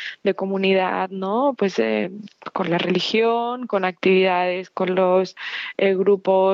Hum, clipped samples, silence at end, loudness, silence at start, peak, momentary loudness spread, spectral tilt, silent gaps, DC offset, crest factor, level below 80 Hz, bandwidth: none; under 0.1%; 0 s; -21 LUFS; 0 s; -6 dBFS; 9 LU; -6.5 dB/octave; none; under 0.1%; 14 dB; -76 dBFS; 7.2 kHz